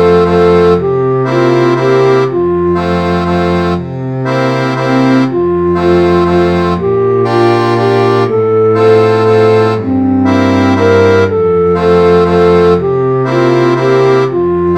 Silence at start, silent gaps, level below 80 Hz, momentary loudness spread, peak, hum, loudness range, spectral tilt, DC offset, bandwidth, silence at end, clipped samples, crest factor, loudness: 0 s; none; -38 dBFS; 5 LU; 0 dBFS; none; 3 LU; -7.5 dB/octave; 0.5%; 9.2 kHz; 0 s; 0.3%; 8 dB; -9 LUFS